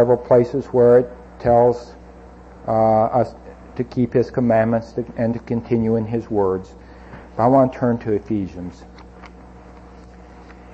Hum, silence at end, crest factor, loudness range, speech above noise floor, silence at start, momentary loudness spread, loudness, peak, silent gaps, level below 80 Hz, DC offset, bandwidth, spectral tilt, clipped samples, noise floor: none; 0.05 s; 16 dB; 4 LU; 24 dB; 0 s; 14 LU; -19 LUFS; -4 dBFS; none; -44 dBFS; under 0.1%; 7.8 kHz; -9.5 dB/octave; under 0.1%; -41 dBFS